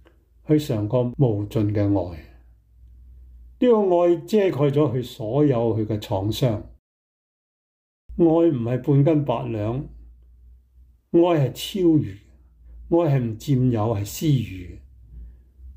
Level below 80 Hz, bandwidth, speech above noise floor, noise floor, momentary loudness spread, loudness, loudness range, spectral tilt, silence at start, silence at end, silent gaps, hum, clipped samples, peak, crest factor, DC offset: -48 dBFS; 16 kHz; 33 dB; -54 dBFS; 10 LU; -21 LUFS; 3 LU; -8 dB/octave; 0.5 s; 0.05 s; 6.79-8.09 s; none; under 0.1%; -8 dBFS; 16 dB; under 0.1%